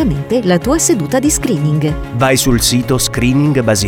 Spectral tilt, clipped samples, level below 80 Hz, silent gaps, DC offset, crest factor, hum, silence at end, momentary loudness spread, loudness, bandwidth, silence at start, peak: -4.5 dB/octave; under 0.1%; -28 dBFS; none; under 0.1%; 12 dB; none; 0 s; 4 LU; -13 LUFS; 19.5 kHz; 0 s; 0 dBFS